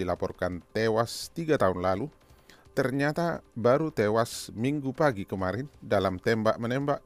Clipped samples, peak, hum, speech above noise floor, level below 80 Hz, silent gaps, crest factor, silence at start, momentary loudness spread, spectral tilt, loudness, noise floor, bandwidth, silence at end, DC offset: under 0.1%; -10 dBFS; none; 28 dB; -56 dBFS; none; 18 dB; 0 s; 7 LU; -6 dB/octave; -28 LUFS; -55 dBFS; 15.5 kHz; 0.05 s; under 0.1%